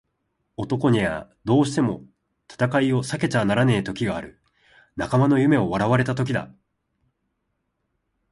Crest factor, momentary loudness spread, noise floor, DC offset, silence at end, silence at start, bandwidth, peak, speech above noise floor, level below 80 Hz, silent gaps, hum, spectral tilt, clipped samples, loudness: 18 dB; 14 LU; -75 dBFS; under 0.1%; 1.85 s; 0.6 s; 11.5 kHz; -6 dBFS; 54 dB; -52 dBFS; none; none; -7 dB/octave; under 0.1%; -22 LUFS